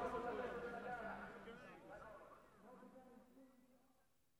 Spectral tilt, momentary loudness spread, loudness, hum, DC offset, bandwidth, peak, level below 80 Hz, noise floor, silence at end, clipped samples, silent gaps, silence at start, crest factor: -6 dB/octave; 19 LU; -51 LUFS; none; under 0.1%; 19 kHz; -34 dBFS; -74 dBFS; -81 dBFS; 0.45 s; under 0.1%; none; 0 s; 18 dB